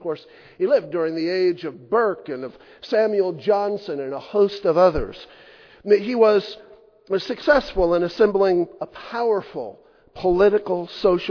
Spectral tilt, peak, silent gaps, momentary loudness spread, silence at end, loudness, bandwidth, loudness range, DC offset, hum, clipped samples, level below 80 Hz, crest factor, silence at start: -7 dB/octave; -4 dBFS; none; 16 LU; 0 s; -21 LUFS; 5.4 kHz; 3 LU; under 0.1%; none; under 0.1%; -44 dBFS; 18 dB; 0.05 s